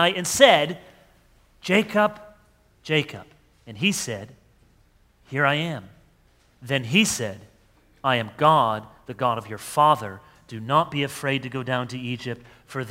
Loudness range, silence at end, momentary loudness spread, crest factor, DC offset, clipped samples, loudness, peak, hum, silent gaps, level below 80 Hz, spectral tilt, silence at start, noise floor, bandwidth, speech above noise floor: 5 LU; 0 s; 18 LU; 24 dB; under 0.1%; under 0.1%; -22 LUFS; 0 dBFS; none; none; -60 dBFS; -4 dB/octave; 0 s; -59 dBFS; 16 kHz; 37 dB